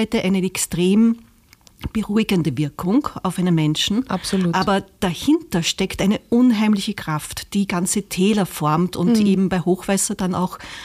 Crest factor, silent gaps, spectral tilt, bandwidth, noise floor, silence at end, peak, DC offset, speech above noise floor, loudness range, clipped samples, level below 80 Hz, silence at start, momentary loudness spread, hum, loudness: 12 dB; none; -5 dB/octave; 15.5 kHz; -51 dBFS; 0 s; -8 dBFS; under 0.1%; 32 dB; 1 LU; under 0.1%; -46 dBFS; 0 s; 8 LU; none; -20 LUFS